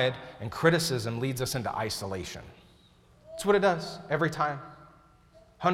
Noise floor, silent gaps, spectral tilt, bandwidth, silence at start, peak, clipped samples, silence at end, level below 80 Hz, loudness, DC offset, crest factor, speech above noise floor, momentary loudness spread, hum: -59 dBFS; none; -4.5 dB/octave; 17 kHz; 0 s; -10 dBFS; under 0.1%; 0 s; -58 dBFS; -29 LUFS; under 0.1%; 20 dB; 30 dB; 16 LU; none